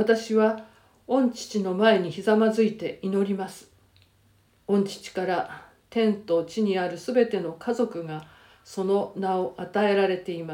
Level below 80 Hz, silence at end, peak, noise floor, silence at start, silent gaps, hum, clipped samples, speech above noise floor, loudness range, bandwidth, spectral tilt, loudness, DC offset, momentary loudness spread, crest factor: -68 dBFS; 0 s; -6 dBFS; -62 dBFS; 0 s; none; none; under 0.1%; 37 dB; 5 LU; 16 kHz; -6 dB/octave; -25 LUFS; under 0.1%; 11 LU; 20 dB